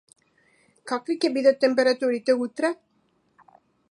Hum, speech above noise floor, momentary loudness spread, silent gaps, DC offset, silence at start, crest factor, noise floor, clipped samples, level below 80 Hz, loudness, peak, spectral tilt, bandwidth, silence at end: none; 45 dB; 11 LU; none; under 0.1%; 0.85 s; 18 dB; -67 dBFS; under 0.1%; -80 dBFS; -23 LUFS; -6 dBFS; -3.5 dB/octave; 11 kHz; 1.15 s